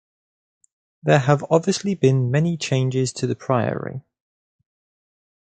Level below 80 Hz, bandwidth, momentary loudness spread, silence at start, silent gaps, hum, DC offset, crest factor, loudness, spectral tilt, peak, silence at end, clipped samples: -60 dBFS; 9.4 kHz; 10 LU; 1.05 s; none; none; under 0.1%; 20 dB; -21 LUFS; -6 dB/octave; -2 dBFS; 1.5 s; under 0.1%